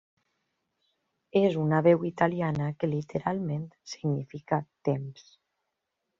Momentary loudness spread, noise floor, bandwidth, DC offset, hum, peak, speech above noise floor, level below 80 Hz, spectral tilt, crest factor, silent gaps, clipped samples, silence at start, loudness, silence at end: 10 LU; -83 dBFS; 7.4 kHz; under 0.1%; none; -8 dBFS; 55 dB; -66 dBFS; -7 dB/octave; 22 dB; none; under 0.1%; 1.35 s; -28 LUFS; 1 s